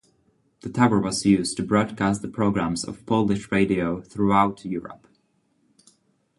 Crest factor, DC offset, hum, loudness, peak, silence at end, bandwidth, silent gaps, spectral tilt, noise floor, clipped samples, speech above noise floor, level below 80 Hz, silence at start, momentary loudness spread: 20 dB; under 0.1%; none; -23 LUFS; -4 dBFS; 1.45 s; 11.5 kHz; none; -5.5 dB/octave; -67 dBFS; under 0.1%; 45 dB; -52 dBFS; 0.65 s; 12 LU